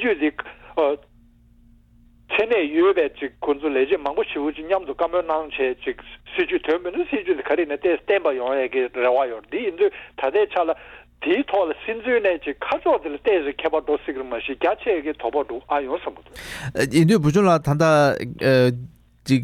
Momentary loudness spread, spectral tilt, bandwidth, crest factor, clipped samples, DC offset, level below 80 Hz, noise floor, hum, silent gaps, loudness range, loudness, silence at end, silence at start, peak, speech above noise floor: 11 LU; -6.5 dB/octave; 15 kHz; 18 dB; under 0.1%; under 0.1%; -52 dBFS; -53 dBFS; none; none; 4 LU; -22 LUFS; 0 s; 0 s; -2 dBFS; 32 dB